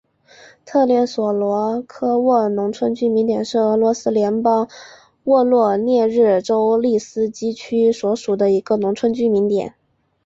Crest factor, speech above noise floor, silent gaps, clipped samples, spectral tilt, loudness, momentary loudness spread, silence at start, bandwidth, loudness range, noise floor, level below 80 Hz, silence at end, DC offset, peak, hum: 14 dB; 30 dB; none; under 0.1%; -6.5 dB/octave; -18 LUFS; 6 LU; 0.65 s; 7.8 kHz; 2 LU; -47 dBFS; -62 dBFS; 0.55 s; under 0.1%; -4 dBFS; none